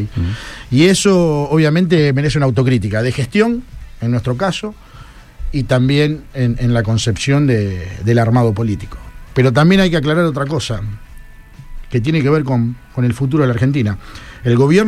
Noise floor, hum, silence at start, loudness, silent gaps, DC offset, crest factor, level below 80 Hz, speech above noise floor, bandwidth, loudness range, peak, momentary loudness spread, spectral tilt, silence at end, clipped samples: -37 dBFS; none; 0 s; -15 LUFS; none; under 0.1%; 14 dB; -34 dBFS; 23 dB; 13 kHz; 4 LU; 0 dBFS; 12 LU; -6.5 dB/octave; 0 s; under 0.1%